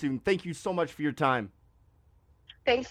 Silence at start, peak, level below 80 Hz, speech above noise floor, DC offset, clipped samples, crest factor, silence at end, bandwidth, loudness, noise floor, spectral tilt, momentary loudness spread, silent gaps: 0 s; -12 dBFS; -60 dBFS; 34 dB; under 0.1%; under 0.1%; 20 dB; 0 s; 14.5 kHz; -30 LUFS; -63 dBFS; -5.5 dB/octave; 5 LU; none